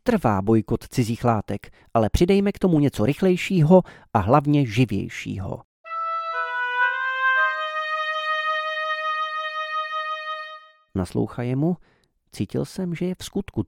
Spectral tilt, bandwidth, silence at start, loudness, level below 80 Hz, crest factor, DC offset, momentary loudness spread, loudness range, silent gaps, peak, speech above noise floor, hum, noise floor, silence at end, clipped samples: -6.5 dB/octave; 16.5 kHz; 0.05 s; -23 LUFS; -44 dBFS; 20 dB; under 0.1%; 12 LU; 8 LU; 5.65-5.84 s; -2 dBFS; 22 dB; none; -43 dBFS; 0.05 s; under 0.1%